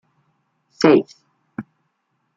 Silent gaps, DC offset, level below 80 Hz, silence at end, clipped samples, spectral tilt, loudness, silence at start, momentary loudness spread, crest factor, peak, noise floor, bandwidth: none; under 0.1%; -62 dBFS; 0.75 s; under 0.1%; -6 dB/octave; -16 LUFS; 0.8 s; 22 LU; 20 dB; -2 dBFS; -71 dBFS; 7.6 kHz